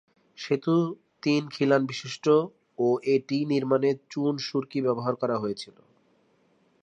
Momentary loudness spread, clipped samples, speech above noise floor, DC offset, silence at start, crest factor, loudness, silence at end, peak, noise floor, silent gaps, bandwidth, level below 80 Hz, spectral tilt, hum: 9 LU; under 0.1%; 40 dB; under 0.1%; 0.4 s; 18 dB; -26 LUFS; 1.15 s; -8 dBFS; -66 dBFS; none; 9.6 kHz; -76 dBFS; -6.5 dB/octave; none